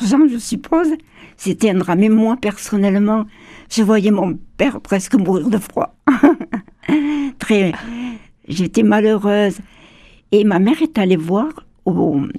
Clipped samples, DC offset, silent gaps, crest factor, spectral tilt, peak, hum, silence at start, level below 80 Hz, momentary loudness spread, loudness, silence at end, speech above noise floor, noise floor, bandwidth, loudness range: under 0.1%; under 0.1%; none; 16 dB; -6.5 dB/octave; 0 dBFS; none; 0 s; -48 dBFS; 12 LU; -16 LUFS; 0 s; 30 dB; -45 dBFS; 14 kHz; 2 LU